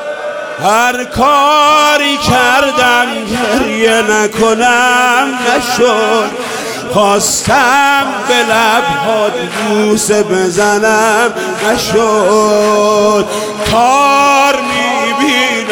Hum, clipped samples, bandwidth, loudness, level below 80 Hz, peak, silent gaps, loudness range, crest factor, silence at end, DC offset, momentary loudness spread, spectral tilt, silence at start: none; under 0.1%; 18.5 kHz; -10 LUFS; -42 dBFS; 0 dBFS; none; 1 LU; 10 dB; 0 s; under 0.1%; 7 LU; -3 dB/octave; 0 s